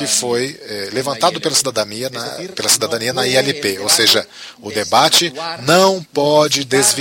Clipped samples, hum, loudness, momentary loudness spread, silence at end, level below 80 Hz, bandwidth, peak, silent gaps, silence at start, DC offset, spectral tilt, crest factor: under 0.1%; none; -15 LUFS; 12 LU; 0 s; -58 dBFS; 16.5 kHz; 0 dBFS; none; 0 s; under 0.1%; -2 dB/octave; 16 dB